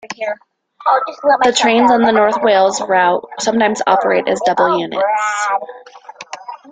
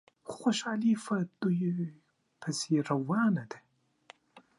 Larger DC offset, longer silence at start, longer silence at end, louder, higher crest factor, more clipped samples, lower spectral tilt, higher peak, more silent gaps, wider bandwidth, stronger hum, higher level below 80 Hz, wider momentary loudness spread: neither; second, 0.05 s vs 0.25 s; about the same, 0.15 s vs 0.2 s; first, -14 LUFS vs -31 LUFS; about the same, 14 dB vs 16 dB; neither; second, -3 dB/octave vs -5.5 dB/octave; first, 0 dBFS vs -16 dBFS; neither; second, 9.6 kHz vs 11.5 kHz; neither; first, -58 dBFS vs -80 dBFS; first, 18 LU vs 13 LU